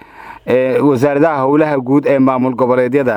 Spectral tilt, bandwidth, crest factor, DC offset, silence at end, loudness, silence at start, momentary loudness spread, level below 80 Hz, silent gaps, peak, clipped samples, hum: -8.5 dB/octave; 12 kHz; 12 dB; under 0.1%; 0 s; -13 LUFS; 0.2 s; 3 LU; -54 dBFS; none; 0 dBFS; under 0.1%; none